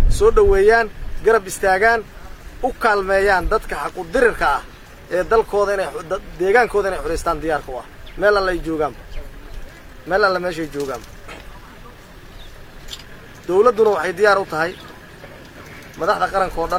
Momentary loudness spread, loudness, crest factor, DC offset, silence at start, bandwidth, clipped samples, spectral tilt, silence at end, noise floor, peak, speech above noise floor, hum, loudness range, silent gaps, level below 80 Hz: 23 LU; -18 LUFS; 18 dB; under 0.1%; 0 s; 16 kHz; under 0.1%; -4.5 dB/octave; 0 s; -39 dBFS; -2 dBFS; 22 dB; none; 7 LU; none; -30 dBFS